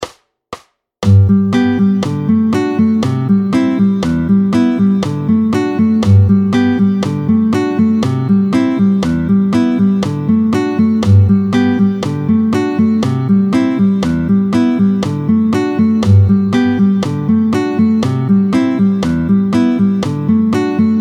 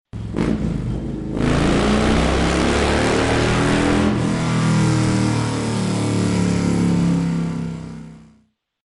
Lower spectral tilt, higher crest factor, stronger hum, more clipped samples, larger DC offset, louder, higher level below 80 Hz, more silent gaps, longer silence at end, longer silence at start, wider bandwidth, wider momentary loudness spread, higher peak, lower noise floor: first, -8 dB/octave vs -6 dB/octave; about the same, 12 dB vs 12 dB; neither; neither; neither; first, -12 LUFS vs -19 LUFS; second, -40 dBFS vs -30 dBFS; neither; second, 0 s vs 0.6 s; second, 0 s vs 0.15 s; second, 10 kHz vs 11.5 kHz; second, 4 LU vs 9 LU; first, 0 dBFS vs -6 dBFS; second, -34 dBFS vs -59 dBFS